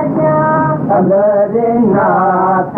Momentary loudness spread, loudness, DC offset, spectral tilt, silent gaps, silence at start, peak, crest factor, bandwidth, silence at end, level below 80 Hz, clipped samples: 2 LU; -11 LUFS; under 0.1%; -12 dB/octave; none; 0 s; -4 dBFS; 8 dB; 3.2 kHz; 0 s; -48 dBFS; under 0.1%